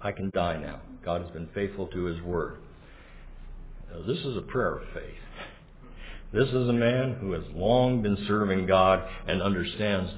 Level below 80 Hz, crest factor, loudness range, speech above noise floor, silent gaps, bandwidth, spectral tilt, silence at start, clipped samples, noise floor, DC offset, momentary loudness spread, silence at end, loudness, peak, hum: -44 dBFS; 20 dB; 10 LU; 21 dB; none; 4 kHz; -10.5 dB/octave; 0 s; under 0.1%; -48 dBFS; under 0.1%; 21 LU; 0 s; -28 LUFS; -10 dBFS; none